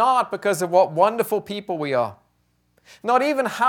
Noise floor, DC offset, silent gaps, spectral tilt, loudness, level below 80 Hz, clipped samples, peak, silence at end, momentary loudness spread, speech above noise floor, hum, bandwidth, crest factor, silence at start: -66 dBFS; under 0.1%; none; -4.5 dB/octave; -21 LUFS; -70 dBFS; under 0.1%; -4 dBFS; 0 s; 9 LU; 46 dB; 60 Hz at -60 dBFS; 19 kHz; 18 dB; 0 s